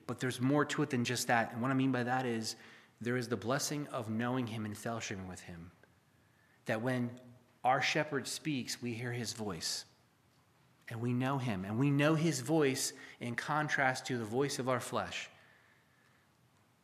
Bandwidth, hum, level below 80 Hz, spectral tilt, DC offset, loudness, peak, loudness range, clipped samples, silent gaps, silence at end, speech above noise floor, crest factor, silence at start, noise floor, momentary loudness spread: 15 kHz; none; -78 dBFS; -4.5 dB/octave; under 0.1%; -35 LUFS; -14 dBFS; 6 LU; under 0.1%; none; 1.55 s; 34 dB; 22 dB; 0.1 s; -69 dBFS; 11 LU